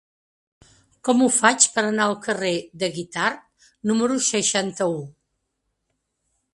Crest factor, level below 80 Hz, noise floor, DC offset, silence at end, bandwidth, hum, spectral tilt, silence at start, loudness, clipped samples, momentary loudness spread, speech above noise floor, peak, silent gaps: 24 dB; -68 dBFS; -76 dBFS; under 0.1%; 1.45 s; 11.5 kHz; none; -2.5 dB/octave; 1.05 s; -21 LUFS; under 0.1%; 13 LU; 55 dB; 0 dBFS; none